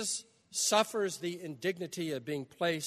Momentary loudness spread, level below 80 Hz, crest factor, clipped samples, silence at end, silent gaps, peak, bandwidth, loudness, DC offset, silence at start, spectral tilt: 11 LU; -80 dBFS; 22 dB; under 0.1%; 0 s; none; -12 dBFS; 13.5 kHz; -34 LUFS; under 0.1%; 0 s; -2.5 dB/octave